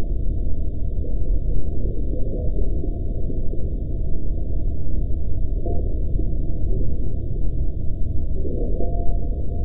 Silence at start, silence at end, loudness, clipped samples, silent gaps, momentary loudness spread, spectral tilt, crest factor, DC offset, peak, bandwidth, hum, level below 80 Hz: 0 s; 0 s; -28 LUFS; under 0.1%; none; 2 LU; -14 dB/octave; 12 dB; under 0.1%; -6 dBFS; 0.7 kHz; none; -24 dBFS